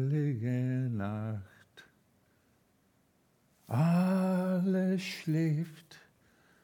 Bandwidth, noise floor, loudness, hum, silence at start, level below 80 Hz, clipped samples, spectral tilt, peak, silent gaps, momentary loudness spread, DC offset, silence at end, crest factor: 16.5 kHz; -70 dBFS; -32 LUFS; none; 0 s; -82 dBFS; under 0.1%; -8 dB/octave; -18 dBFS; none; 9 LU; under 0.1%; 0.65 s; 14 dB